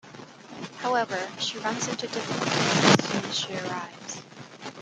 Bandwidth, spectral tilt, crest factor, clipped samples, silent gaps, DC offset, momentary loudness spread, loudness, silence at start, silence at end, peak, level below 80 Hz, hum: 12.5 kHz; -3.5 dB/octave; 24 dB; under 0.1%; none; under 0.1%; 21 LU; -26 LUFS; 0.05 s; 0 s; -2 dBFS; -66 dBFS; none